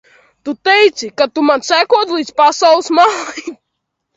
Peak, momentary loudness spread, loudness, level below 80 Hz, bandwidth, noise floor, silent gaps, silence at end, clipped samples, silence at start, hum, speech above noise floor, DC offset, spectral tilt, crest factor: 0 dBFS; 15 LU; -12 LUFS; -60 dBFS; 8 kHz; -73 dBFS; none; 0.65 s; under 0.1%; 0.45 s; none; 61 dB; under 0.1%; -1.5 dB/octave; 14 dB